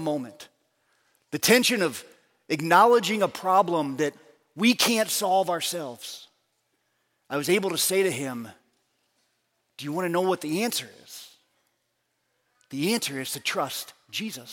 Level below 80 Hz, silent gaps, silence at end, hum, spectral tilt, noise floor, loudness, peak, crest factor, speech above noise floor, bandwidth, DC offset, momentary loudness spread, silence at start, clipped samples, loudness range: -78 dBFS; none; 0 s; none; -3 dB/octave; -75 dBFS; -24 LUFS; -4 dBFS; 22 dB; 51 dB; 17 kHz; under 0.1%; 19 LU; 0 s; under 0.1%; 9 LU